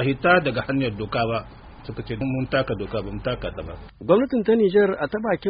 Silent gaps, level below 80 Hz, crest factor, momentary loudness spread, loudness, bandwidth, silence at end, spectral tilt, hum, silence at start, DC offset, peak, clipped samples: none; -44 dBFS; 20 dB; 16 LU; -22 LUFS; 5.2 kHz; 0 s; -5 dB/octave; none; 0 s; under 0.1%; -4 dBFS; under 0.1%